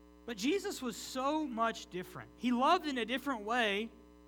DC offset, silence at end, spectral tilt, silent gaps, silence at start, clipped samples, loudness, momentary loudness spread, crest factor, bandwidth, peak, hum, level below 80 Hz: under 0.1%; 0.05 s; -3.5 dB/octave; none; 0 s; under 0.1%; -35 LUFS; 14 LU; 18 dB; over 20 kHz; -18 dBFS; 60 Hz at -65 dBFS; -64 dBFS